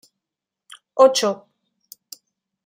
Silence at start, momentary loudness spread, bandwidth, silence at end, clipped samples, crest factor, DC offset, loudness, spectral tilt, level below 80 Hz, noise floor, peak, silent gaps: 0.95 s; 25 LU; 16 kHz; 1.3 s; under 0.1%; 22 dB; under 0.1%; -18 LUFS; -2.5 dB/octave; -80 dBFS; -86 dBFS; -2 dBFS; none